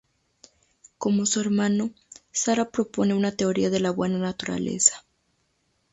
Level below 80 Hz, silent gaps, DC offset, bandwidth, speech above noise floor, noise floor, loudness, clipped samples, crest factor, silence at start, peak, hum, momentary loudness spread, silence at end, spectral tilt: -62 dBFS; none; under 0.1%; 8 kHz; 47 dB; -71 dBFS; -24 LUFS; under 0.1%; 22 dB; 1 s; -2 dBFS; none; 9 LU; 0.95 s; -4 dB/octave